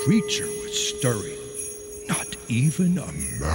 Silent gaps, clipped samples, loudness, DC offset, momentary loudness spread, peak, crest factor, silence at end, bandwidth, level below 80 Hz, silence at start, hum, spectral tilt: none; under 0.1%; -25 LUFS; under 0.1%; 10 LU; -8 dBFS; 16 dB; 0 s; 16.5 kHz; -44 dBFS; 0 s; none; -4.5 dB/octave